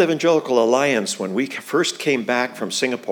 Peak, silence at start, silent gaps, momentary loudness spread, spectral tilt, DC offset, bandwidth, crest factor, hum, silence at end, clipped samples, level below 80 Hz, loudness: -2 dBFS; 0 s; none; 6 LU; -3.5 dB/octave; under 0.1%; 20 kHz; 18 dB; none; 0 s; under 0.1%; -88 dBFS; -20 LUFS